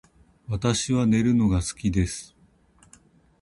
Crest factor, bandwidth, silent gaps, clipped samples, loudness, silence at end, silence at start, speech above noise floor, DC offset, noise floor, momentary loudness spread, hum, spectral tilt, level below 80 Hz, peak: 18 dB; 11.5 kHz; none; under 0.1%; -24 LUFS; 1.15 s; 0.5 s; 36 dB; under 0.1%; -58 dBFS; 9 LU; none; -5.5 dB/octave; -40 dBFS; -8 dBFS